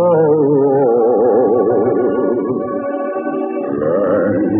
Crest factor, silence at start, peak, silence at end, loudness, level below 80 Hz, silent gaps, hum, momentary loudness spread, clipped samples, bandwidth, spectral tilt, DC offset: 10 dB; 0 s; -4 dBFS; 0 s; -15 LUFS; -56 dBFS; none; none; 8 LU; under 0.1%; 3.1 kHz; -14 dB/octave; under 0.1%